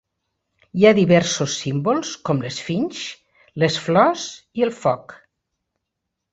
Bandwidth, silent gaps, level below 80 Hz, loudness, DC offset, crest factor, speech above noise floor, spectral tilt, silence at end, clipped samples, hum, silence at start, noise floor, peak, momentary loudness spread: 8.2 kHz; none; -58 dBFS; -20 LUFS; under 0.1%; 20 dB; 61 dB; -5 dB/octave; 1.15 s; under 0.1%; none; 0.75 s; -80 dBFS; 0 dBFS; 14 LU